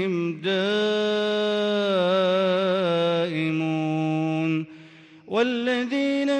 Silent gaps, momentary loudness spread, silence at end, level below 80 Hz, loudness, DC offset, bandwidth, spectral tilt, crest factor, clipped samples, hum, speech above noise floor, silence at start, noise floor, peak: none; 4 LU; 0 s; -72 dBFS; -23 LUFS; under 0.1%; 9.8 kHz; -6 dB/octave; 12 dB; under 0.1%; none; 25 dB; 0 s; -48 dBFS; -10 dBFS